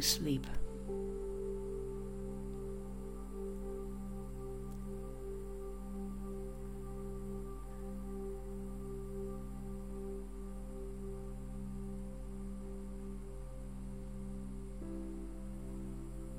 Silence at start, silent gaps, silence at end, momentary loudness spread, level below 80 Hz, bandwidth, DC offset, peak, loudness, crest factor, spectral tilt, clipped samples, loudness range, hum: 0 s; none; 0 s; 5 LU; -46 dBFS; 16 kHz; 0.3%; -18 dBFS; -45 LUFS; 24 dB; -4.5 dB/octave; under 0.1%; 3 LU; none